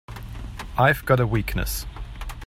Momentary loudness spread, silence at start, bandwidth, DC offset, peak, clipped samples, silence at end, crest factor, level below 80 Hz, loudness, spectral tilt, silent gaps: 17 LU; 0.1 s; 16.5 kHz; under 0.1%; -4 dBFS; under 0.1%; 0 s; 20 dB; -34 dBFS; -23 LUFS; -5.5 dB/octave; none